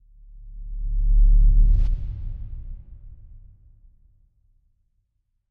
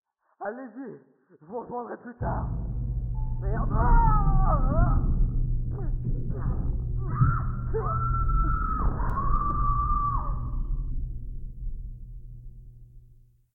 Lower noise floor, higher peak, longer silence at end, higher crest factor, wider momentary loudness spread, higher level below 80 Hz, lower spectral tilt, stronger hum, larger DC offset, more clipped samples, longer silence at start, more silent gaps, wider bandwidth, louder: first, -72 dBFS vs -55 dBFS; about the same, -8 dBFS vs -8 dBFS; first, 2.15 s vs 0.55 s; about the same, 14 dB vs 16 dB; first, 25 LU vs 16 LU; first, -22 dBFS vs -28 dBFS; second, -10 dB/octave vs -12.5 dB/octave; neither; neither; neither; about the same, 0.4 s vs 0.4 s; neither; second, 0.6 kHz vs 2 kHz; first, -24 LUFS vs -29 LUFS